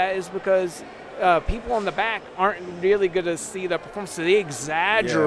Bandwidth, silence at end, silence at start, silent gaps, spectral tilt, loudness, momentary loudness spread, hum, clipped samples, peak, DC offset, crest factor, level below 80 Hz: 11 kHz; 0 s; 0 s; none; -4 dB/octave; -23 LUFS; 8 LU; none; under 0.1%; -6 dBFS; under 0.1%; 18 dB; -40 dBFS